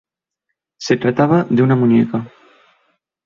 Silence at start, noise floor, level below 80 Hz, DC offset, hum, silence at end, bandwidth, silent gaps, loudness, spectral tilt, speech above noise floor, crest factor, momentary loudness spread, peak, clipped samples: 0.8 s; -77 dBFS; -56 dBFS; under 0.1%; none; 1 s; 7.4 kHz; none; -15 LUFS; -7.5 dB/octave; 63 dB; 16 dB; 14 LU; -2 dBFS; under 0.1%